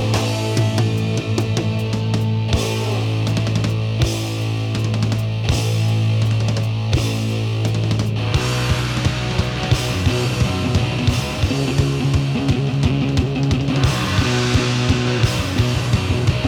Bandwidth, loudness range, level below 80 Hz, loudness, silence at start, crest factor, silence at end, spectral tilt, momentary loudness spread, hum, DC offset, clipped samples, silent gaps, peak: 15 kHz; 2 LU; -32 dBFS; -19 LUFS; 0 s; 16 dB; 0 s; -5.5 dB/octave; 3 LU; none; under 0.1%; under 0.1%; none; -2 dBFS